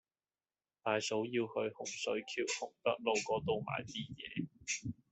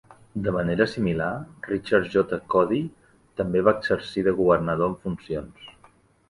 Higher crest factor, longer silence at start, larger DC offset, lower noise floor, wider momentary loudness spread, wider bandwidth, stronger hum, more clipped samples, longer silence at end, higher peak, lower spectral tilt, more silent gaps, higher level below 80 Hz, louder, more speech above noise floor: about the same, 20 dB vs 20 dB; first, 0.85 s vs 0.35 s; neither; first, under -90 dBFS vs -57 dBFS; second, 8 LU vs 12 LU; second, 8.2 kHz vs 11.5 kHz; neither; neither; second, 0.2 s vs 0.6 s; second, -18 dBFS vs -4 dBFS; second, -3.5 dB/octave vs -7.5 dB/octave; neither; second, -72 dBFS vs -50 dBFS; second, -38 LUFS vs -24 LUFS; first, over 52 dB vs 34 dB